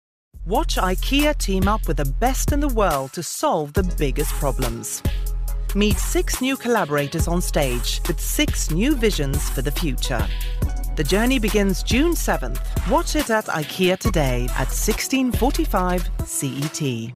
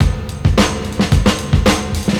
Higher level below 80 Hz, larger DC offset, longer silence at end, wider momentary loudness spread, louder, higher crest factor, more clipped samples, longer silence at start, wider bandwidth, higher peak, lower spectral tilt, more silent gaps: about the same, -24 dBFS vs -22 dBFS; first, 0.5% vs under 0.1%; about the same, 0 s vs 0 s; about the same, 6 LU vs 4 LU; second, -22 LUFS vs -15 LUFS; about the same, 14 dB vs 14 dB; neither; first, 0.35 s vs 0 s; about the same, 15.5 kHz vs 17 kHz; second, -8 dBFS vs 0 dBFS; about the same, -4.5 dB/octave vs -5.5 dB/octave; neither